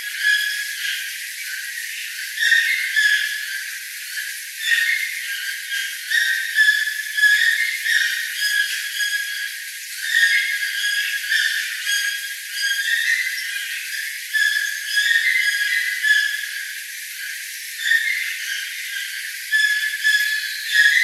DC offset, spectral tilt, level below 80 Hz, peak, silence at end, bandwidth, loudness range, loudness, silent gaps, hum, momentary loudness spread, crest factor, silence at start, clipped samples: under 0.1%; 9.5 dB/octave; under -90 dBFS; -2 dBFS; 0 s; 16 kHz; 3 LU; -19 LUFS; none; none; 11 LU; 18 dB; 0 s; under 0.1%